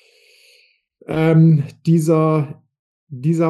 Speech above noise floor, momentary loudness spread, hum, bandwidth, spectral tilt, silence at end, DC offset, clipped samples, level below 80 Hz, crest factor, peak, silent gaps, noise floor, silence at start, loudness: 41 dB; 13 LU; none; 12 kHz; -8.5 dB/octave; 0 s; under 0.1%; under 0.1%; -58 dBFS; 14 dB; -4 dBFS; 2.79-3.07 s; -56 dBFS; 1.1 s; -16 LUFS